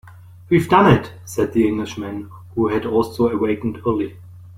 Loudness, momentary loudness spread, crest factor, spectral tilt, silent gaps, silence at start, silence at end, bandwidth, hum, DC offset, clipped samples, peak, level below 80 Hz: -19 LUFS; 16 LU; 18 dB; -7 dB/octave; none; 0.05 s; 0 s; 16 kHz; none; under 0.1%; under 0.1%; -2 dBFS; -48 dBFS